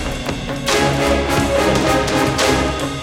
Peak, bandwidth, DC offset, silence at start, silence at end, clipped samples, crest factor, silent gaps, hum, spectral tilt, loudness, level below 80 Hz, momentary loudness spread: -2 dBFS; 17 kHz; under 0.1%; 0 s; 0 s; under 0.1%; 16 dB; none; none; -4 dB/octave; -16 LUFS; -30 dBFS; 7 LU